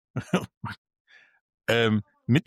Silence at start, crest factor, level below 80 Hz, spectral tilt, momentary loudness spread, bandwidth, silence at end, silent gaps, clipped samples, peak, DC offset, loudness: 0.15 s; 18 dB; -60 dBFS; -6 dB/octave; 16 LU; 13.5 kHz; 0.05 s; 0.57-0.61 s, 0.78-0.85 s, 1.00-1.05 s, 1.41-1.58 s; under 0.1%; -10 dBFS; under 0.1%; -27 LUFS